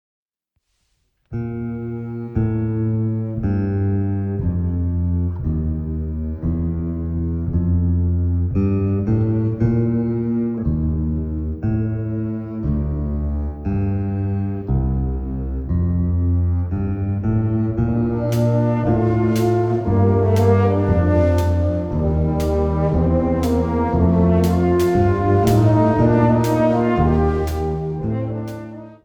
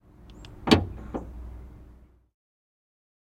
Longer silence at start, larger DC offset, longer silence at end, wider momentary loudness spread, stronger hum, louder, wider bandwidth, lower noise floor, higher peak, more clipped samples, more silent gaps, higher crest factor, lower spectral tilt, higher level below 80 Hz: first, 1.3 s vs 0.2 s; neither; second, 0.1 s vs 1.4 s; second, 9 LU vs 25 LU; neither; first, -20 LUFS vs -26 LUFS; first, 18 kHz vs 16 kHz; first, -73 dBFS vs -53 dBFS; about the same, -2 dBFS vs -2 dBFS; neither; neither; second, 16 dB vs 28 dB; first, -9 dB/octave vs -5.5 dB/octave; first, -28 dBFS vs -44 dBFS